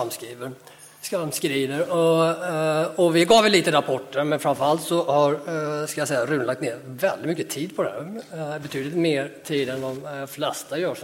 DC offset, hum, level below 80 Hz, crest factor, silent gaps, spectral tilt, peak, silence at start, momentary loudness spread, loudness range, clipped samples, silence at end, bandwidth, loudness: under 0.1%; none; -66 dBFS; 18 dB; none; -4.5 dB/octave; -4 dBFS; 0 s; 13 LU; 7 LU; under 0.1%; 0 s; 17 kHz; -23 LUFS